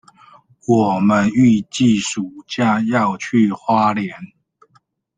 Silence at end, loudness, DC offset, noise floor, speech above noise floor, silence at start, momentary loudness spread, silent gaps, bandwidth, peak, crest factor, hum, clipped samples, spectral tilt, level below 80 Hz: 0.9 s; -17 LUFS; under 0.1%; -59 dBFS; 43 dB; 0.7 s; 12 LU; none; 9.4 kHz; -2 dBFS; 16 dB; none; under 0.1%; -5.5 dB/octave; -56 dBFS